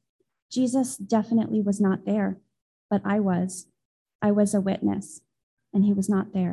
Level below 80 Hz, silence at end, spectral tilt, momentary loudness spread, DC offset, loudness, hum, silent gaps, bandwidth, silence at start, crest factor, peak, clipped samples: -62 dBFS; 0 s; -7 dB/octave; 9 LU; under 0.1%; -25 LUFS; none; 2.61-2.89 s, 3.85-4.06 s, 4.15-4.19 s, 5.43-5.57 s; 12.5 kHz; 0.5 s; 16 dB; -10 dBFS; under 0.1%